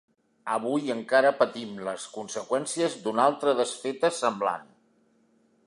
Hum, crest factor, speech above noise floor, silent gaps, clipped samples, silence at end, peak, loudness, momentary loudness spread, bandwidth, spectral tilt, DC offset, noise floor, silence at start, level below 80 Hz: none; 20 dB; 39 dB; none; under 0.1%; 1.05 s; -8 dBFS; -27 LUFS; 12 LU; 11.5 kHz; -3.5 dB/octave; under 0.1%; -65 dBFS; 0.45 s; -80 dBFS